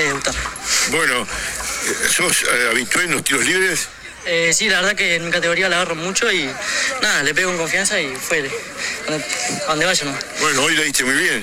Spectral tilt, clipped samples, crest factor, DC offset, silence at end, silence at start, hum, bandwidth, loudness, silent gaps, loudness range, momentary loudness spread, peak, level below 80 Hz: -1.5 dB/octave; under 0.1%; 18 dB; under 0.1%; 0 s; 0 s; none; 16.5 kHz; -17 LUFS; none; 3 LU; 8 LU; 0 dBFS; -44 dBFS